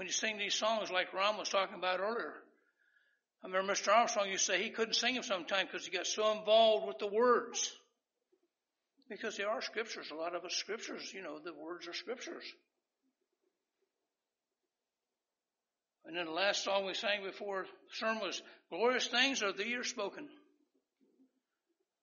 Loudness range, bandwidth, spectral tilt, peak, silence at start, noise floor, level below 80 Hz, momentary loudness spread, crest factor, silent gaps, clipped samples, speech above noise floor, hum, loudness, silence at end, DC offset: 14 LU; 7.2 kHz; 0.5 dB/octave; -16 dBFS; 0 s; under -90 dBFS; under -90 dBFS; 15 LU; 22 dB; none; under 0.1%; over 54 dB; none; -35 LUFS; 1.65 s; under 0.1%